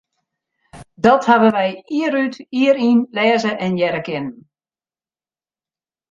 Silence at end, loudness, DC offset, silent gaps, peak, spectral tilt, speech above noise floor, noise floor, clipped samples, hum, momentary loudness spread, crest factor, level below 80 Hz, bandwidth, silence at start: 1.8 s; -17 LUFS; under 0.1%; none; -2 dBFS; -6 dB/octave; over 74 dB; under -90 dBFS; under 0.1%; none; 10 LU; 18 dB; -60 dBFS; 7.6 kHz; 0.75 s